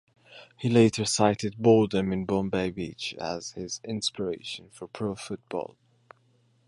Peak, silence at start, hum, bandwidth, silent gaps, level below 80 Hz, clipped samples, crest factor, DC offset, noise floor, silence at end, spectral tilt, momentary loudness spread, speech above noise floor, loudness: -8 dBFS; 0.3 s; none; 11.5 kHz; none; -58 dBFS; under 0.1%; 20 dB; under 0.1%; -65 dBFS; 1.05 s; -5 dB/octave; 14 LU; 39 dB; -27 LUFS